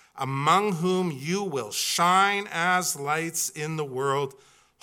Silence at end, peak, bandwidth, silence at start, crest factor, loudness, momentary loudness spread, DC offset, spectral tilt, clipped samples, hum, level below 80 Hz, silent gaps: 0.5 s; -6 dBFS; 17.5 kHz; 0.15 s; 20 dB; -25 LUFS; 8 LU; under 0.1%; -3.5 dB/octave; under 0.1%; none; -76 dBFS; none